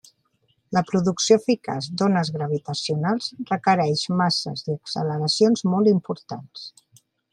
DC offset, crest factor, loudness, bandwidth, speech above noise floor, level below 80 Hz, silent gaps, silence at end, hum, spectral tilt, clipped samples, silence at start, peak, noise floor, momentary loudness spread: under 0.1%; 20 dB; -22 LUFS; 11 kHz; 46 dB; -66 dBFS; none; 0.65 s; none; -5 dB/octave; under 0.1%; 0.7 s; -4 dBFS; -68 dBFS; 12 LU